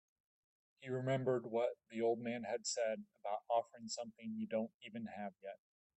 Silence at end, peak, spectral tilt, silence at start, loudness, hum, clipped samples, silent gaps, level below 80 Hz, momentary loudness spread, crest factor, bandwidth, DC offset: 0.4 s; -24 dBFS; -5 dB/octave; 0.8 s; -41 LUFS; none; under 0.1%; 4.74-4.80 s; -88 dBFS; 11 LU; 18 dB; 8.2 kHz; under 0.1%